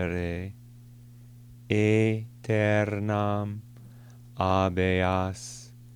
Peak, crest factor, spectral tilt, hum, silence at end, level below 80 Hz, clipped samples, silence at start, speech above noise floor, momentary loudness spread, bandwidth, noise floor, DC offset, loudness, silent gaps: -8 dBFS; 20 dB; -6.5 dB/octave; none; 0 s; -54 dBFS; under 0.1%; 0 s; 23 dB; 17 LU; 11 kHz; -49 dBFS; under 0.1%; -27 LUFS; none